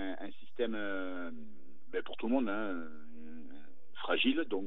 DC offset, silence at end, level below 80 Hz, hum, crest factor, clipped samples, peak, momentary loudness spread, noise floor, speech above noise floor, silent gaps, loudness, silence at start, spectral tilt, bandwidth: 2%; 0 s; under -90 dBFS; none; 20 dB; under 0.1%; -18 dBFS; 21 LU; -59 dBFS; 25 dB; none; -36 LUFS; 0 s; -7.5 dB/octave; 4.2 kHz